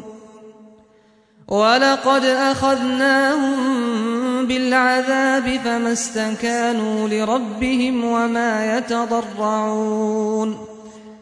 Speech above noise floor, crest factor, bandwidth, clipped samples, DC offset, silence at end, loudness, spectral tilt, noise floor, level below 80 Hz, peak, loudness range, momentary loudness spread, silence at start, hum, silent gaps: 36 dB; 16 dB; 11 kHz; under 0.1%; under 0.1%; 0.05 s; -18 LUFS; -3.5 dB/octave; -54 dBFS; -52 dBFS; -4 dBFS; 3 LU; 6 LU; 0 s; none; none